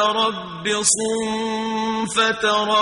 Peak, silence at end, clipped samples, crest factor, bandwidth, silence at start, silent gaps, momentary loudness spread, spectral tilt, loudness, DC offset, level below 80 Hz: -4 dBFS; 0 s; under 0.1%; 18 dB; 11 kHz; 0 s; none; 6 LU; -2 dB/octave; -20 LUFS; under 0.1%; -56 dBFS